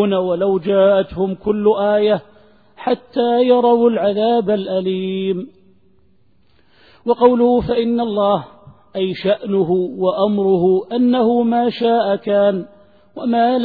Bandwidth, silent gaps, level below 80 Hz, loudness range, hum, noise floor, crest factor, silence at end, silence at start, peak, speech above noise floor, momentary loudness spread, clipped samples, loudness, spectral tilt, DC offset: 4.9 kHz; none; -50 dBFS; 3 LU; none; -58 dBFS; 16 dB; 0 s; 0 s; 0 dBFS; 43 dB; 8 LU; under 0.1%; -16 LUFS; -10 dB/octave; 0.2%